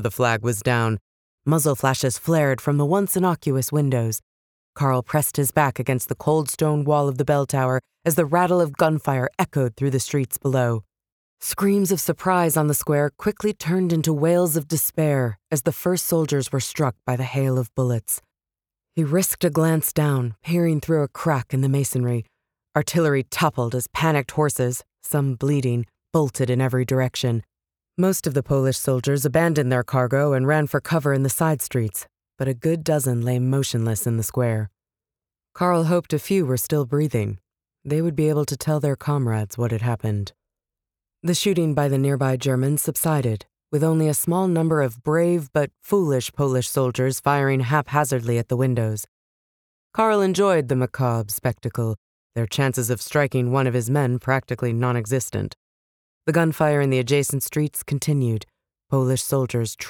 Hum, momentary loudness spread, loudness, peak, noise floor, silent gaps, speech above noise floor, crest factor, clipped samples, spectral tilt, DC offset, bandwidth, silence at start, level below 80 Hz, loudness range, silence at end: none; 6 LU; -22 LUFS; -4 dBFS; under -90 dBFS; 1.01-1.38 s, 4.23-4.73 s, 11.12-11.37 s, 49.08-49.90 s, 51.98-52.30 s, 55.57-56.21 s; over 69 dB; 18 dB; under 0.1%; -5.5 dB/octave; under 0.1%; over 20 kHz; 0 s; -56 dBFS; 3 LU; 0 s